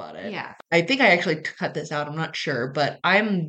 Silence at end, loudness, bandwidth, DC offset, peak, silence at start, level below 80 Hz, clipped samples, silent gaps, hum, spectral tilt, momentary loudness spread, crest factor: 0 s; -22 LUFS; 8.8 kHz; under 0.1%; -4 dBFS; 0 s; -74 dBFS; under 0.1%; none; none; -5 dB/octave; 15 LU; 20 dB